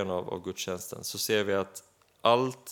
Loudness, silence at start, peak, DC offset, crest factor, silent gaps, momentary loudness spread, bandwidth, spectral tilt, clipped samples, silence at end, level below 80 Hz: -30 LUFS; 0 s; -8 dBFS; under 0.1%; 22 dB; none; 11 LU; 19 kHz; -3.5 dB/octave; under 0.1%; 0 s; -72 dBFS